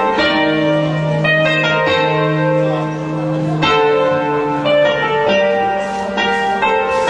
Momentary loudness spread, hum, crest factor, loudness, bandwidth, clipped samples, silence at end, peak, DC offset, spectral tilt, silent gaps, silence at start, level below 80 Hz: 5 LU; none; 12 dB; -15 LUFS; 10 kHz; under 0.1%; 0 s; -2 dBFS; under 0.1%; -6 dB/octave; none; 0 s; -48 dBFS